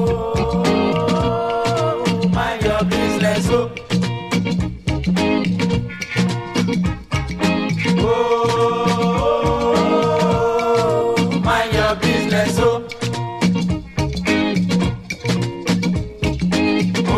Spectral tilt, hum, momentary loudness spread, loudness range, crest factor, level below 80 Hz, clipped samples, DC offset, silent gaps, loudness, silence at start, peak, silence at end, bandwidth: -6 dB/octave; none; 5 LU; 3 LU; 14 dB; -34 dBFS; under 0.1%; under 0.1%; none; -18 LUFS; 0 s; -4 dBFS; 0 s; 14.5 kHz